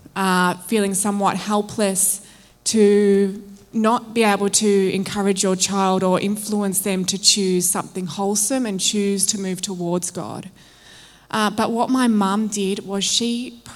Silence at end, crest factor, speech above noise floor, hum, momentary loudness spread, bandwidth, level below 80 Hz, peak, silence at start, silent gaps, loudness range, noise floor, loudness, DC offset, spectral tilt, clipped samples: 0 s; 20 dB; 27 dB; none; 9 LU; 16.5 kHz; -60 dBFS; 0 dBFS; 0.15 s; none; 4 LU; -46 dBFS; -19 LUFS; under 0.1%; -3.5 dB/octave; under 0.1%